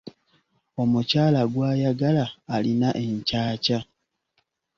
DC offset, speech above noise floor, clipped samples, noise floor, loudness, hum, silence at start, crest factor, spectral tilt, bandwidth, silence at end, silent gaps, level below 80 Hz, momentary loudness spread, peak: under 0.1%; 50 dB; under 0.1%; -73 dBFS; -23 LUFS; none; 0.05 s; 16 dB; -7 dB/octave; 7.2 kHz; 0.95 s; none; -56 dBFS; 7 LU; -8 dBFS